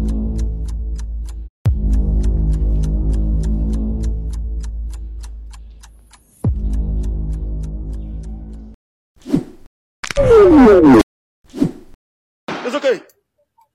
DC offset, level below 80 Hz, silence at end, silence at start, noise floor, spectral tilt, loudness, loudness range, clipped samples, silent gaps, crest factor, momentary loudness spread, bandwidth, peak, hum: under 0.1%; -22 dBFS; 0.75 s; 0 s; -60 dBFS; -7.5 dB/octave; -17 LUFS; 13 LU; under 0.1%; 1.49-1.65 s, 8.74-9.15 s, 9.67-10.03 s, 11.03-11.44 s, 11.94-12.47 s; 14 dB; 23 LU; 11 kHz; -2 dBFS; none